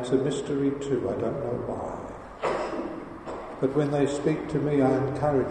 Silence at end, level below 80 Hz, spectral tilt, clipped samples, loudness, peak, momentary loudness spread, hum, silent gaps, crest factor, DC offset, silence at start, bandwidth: 0 s; -52 dBFS; -7 dB/octave; under 0.1%; -27 LUFS; -10 dBFS; 13 LU; none; none; 16 dB; under 0.1%; 0 s; 9.8 kHz